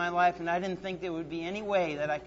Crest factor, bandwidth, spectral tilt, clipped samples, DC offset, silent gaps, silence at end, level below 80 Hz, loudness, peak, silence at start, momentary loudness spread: 16 dB; 7.8 kHz; -5.5 dB/octave; under 0.1%; under 0.1%; none; 0 s; -60 dBFS; -31 LUFS; -14 dBFS; 0 s; 8 LU